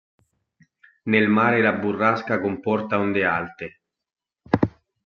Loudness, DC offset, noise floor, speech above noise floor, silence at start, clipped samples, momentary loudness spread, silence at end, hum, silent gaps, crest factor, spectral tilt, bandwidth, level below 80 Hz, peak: -21 LUFS; under 0.1%; -62 dBFS; 41 dB; 1.05 s; under 0.1%; 13 LU; 0.35 s; none; none; 22 dB; -8 dB/octave; 6.6 kHz; -60 dBFS; -2 dBFS